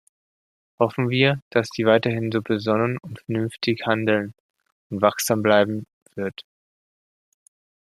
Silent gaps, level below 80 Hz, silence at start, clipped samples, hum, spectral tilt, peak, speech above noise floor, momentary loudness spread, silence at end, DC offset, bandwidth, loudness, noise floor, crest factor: 1.42-1.51 s, 4.40-4.54 s, 4.72-4.90 s, 5.93-6.06 s; -64 dBFS; 0.8 s; under 0.1%; none; -5.5 dB/octave; -2 dBFS; over 68 dB; 13 LU; 1.55 s; under 0.1%; 14.5 kHz; -22 LUFS; under -90 dBFS; 22 dB